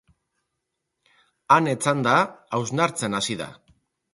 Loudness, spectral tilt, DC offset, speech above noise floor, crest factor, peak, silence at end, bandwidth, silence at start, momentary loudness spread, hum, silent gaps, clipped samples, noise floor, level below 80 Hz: -22 LUFS; -4.5 dB/octave; under 0.1%; 58 dB; 22 dB; -4 dBFS; 0.6 s; 11.5 kHz; 1.5 s; 9 LU; none; none; under 0.1%; -80 dBFS; -64 dBFS